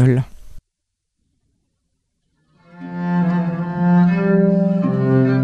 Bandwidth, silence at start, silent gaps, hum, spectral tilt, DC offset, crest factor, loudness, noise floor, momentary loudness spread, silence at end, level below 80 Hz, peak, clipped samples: 4.8 kHz; 0 s; none; none; -10 dB/octave; under 0.1%; 14 dB; -17 LUFS; -76 dBFS; 13 LU; 0 s; -48 dBFS; -4 dBFS; under 0.1%